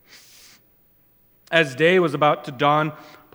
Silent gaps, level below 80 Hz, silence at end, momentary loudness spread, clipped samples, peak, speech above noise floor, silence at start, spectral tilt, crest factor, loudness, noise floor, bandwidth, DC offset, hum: none; -70 dBFS; 0.3 s; 5 LU; under 0.1%; 0 dBFS; 39 dB; 1.5 s; -5.5 dB/octave; 22 dB; -19 LUFS; -59 dBFS; 19.5 kHz; under 0.1%; 60 Hz at -50 dBFS